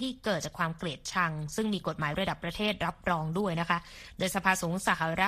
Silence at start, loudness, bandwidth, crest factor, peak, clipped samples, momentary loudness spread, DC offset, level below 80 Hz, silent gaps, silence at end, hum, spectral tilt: 0 s; -31 LUFS; 15 kHz; 22 dB; -10 dBFS; under 0.1%; 5 LU; under 0.1%; -54 dBFS; none; 0 s; none; -4.5 dB/octave